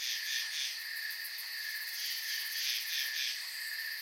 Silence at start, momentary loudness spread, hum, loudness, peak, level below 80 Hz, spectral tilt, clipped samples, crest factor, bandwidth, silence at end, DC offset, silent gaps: 0 s; 5 LU; none; -35 LUFS; -22 dBFS; under -90 dBFS; 6.5 dB/octave; under 0.1%; 16 dB; 17 kHz; 0 s; under 0.1%; none